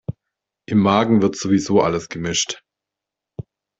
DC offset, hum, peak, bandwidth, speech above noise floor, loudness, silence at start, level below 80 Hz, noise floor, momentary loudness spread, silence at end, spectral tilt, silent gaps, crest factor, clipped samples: under 0.1%; none; -2 dBFS; 8 kHz; 68 dB; -18 LUFS; 0.1 s; -54 dBFS; -85 dBFS; 22 LU; 0.4 s; -5 dB/octave; none; 18 dB; under 0.1%